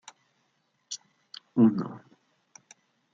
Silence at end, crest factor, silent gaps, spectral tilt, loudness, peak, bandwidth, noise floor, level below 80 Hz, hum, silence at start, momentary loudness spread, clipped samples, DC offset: 1.15 s; 22 dB; none; -6 dB/octave; -28 LUFS; -10 dBFS; 7.6 kHz; -73 dBFS; -78 dBFS; none; 0.9 s; 24 LU; under 0.1%; under 0.1%